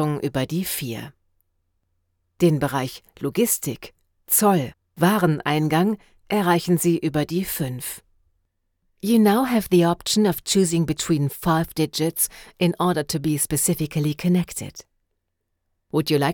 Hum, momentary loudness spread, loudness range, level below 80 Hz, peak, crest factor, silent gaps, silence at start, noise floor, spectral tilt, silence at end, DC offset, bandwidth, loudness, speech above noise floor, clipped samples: none; 13 LU; 5 LU; -52 dBFS; -6 dBFS; 18 dB; none; 0 s; -76 dBFS; -5 dB/octave; 0 s; under 0.1%; over 20 kHz; -22 LUFS; 55 dB; under 0.1%